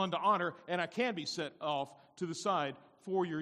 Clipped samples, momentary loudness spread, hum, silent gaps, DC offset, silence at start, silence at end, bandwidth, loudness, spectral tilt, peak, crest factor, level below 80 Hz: under 0.1%; 10 LU; none; none; under 0.1%; 0 s; 0 s; 12 kHz; -36 LUFS; -4.5 dB/octave; -18 dBFS; 18 dB; -82 dBFS